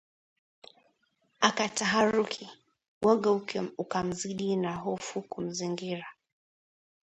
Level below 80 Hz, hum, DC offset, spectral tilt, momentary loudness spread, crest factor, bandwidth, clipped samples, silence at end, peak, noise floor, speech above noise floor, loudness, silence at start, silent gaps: -68 dBFS; none; under 0.1%; -4 dB/octave; 12 LU; 24 dB; 11 kHz; under 0.1%; 0.9 s; -6 dBFS; -73 dBFS; 44 dB; -30 LUFS; 1.4 s; 2.88-3.01 s